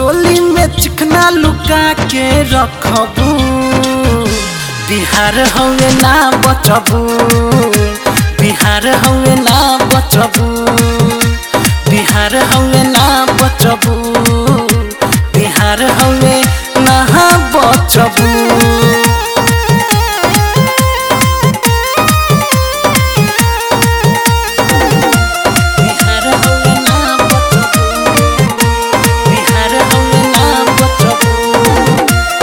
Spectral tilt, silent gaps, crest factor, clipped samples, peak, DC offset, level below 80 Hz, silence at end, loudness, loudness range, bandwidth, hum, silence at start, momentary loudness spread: -4 dB/octave; none; 8 dB; 1%; 0 dBFS; 0.1%; -20 dBFS; 0 s; -9 LUFS; 2 LU; over 20 kHz; none; 0 s; 4 LU